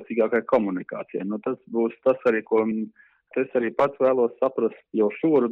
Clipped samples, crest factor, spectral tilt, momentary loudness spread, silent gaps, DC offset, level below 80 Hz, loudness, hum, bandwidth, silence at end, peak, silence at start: under 0.1%; 14 dB; -9 dB/octave; 10 LU; none; under 0.1%; -68 dBFS; -24 LUFS; none; 5.6 kHz; 0 s; -10 dBFS; 0 s